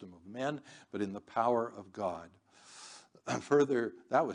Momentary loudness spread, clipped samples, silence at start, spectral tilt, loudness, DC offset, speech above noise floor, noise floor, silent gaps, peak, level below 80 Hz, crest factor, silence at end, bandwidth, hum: 21 LU; under 0.1%; 0 s; -5.5 dB/octave; -34 LUFS; under 0.1%; 22 dB; -55 dBFS; none; -14 dBFS; -80 dBFS; 20 dB; 0 s; 10 kHz; none